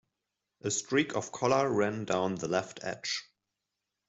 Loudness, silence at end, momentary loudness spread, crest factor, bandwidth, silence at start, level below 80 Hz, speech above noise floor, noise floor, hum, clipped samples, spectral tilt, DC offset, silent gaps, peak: -31 LUFS; 0.85 s; 9 LU; 20 dB; 8.2 kHz; 0.65 s; -72 dBFS; 56 dB; -87 dBFS; none; under 0.1%; -4 dB/octave; under 0.1%; none; -12 dBFS